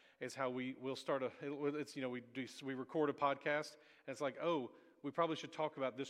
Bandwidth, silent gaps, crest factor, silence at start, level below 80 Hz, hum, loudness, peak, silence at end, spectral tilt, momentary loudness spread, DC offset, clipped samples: 14.5 kHz; none; 20 dB; 0.2 s; -90 dBFS; none; -42 LUFS; -22 dBFS; 0 s; -5 dB/octave; 10 LU; under 0.1%; under 0.1%